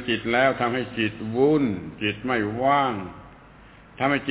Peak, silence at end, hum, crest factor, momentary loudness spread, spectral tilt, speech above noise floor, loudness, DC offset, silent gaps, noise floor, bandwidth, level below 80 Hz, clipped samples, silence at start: -8 dBFS; 0 s; none; 16 dB; 7 LU; -9.5 dB/octave; 25 dB; -23 LUFS; under 0.1%; none; -49 dBFS; 4 kHz; -52 dBFS; under 0.1%; 0 s